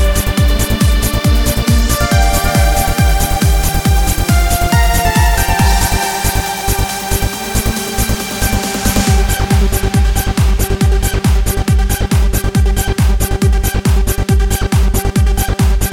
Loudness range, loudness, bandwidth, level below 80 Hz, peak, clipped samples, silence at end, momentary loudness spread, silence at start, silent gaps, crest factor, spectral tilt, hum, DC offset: 2 LU; -14 LUFS; 19 kHz; -14 dBFS; 0 dBFS; under 0.1%; 0 s; 4 LU; 0 s; none; 12 dB; -4.5 dB/octave; none; 0.7%